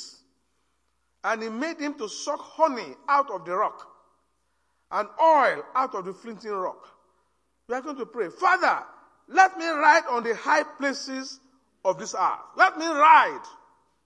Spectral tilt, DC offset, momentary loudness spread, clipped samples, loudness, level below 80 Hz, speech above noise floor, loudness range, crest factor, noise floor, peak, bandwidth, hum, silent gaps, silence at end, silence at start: -2.5 dB/octave; under 0.1%; 15 LU; under 0.1%; -24 LUFS; -78 dBFS; 50 dB; 6 LU; 22 dB; -74 dBFS; -4 dBFS; 10.5 kHz; none; none; 0.55 s; 0 s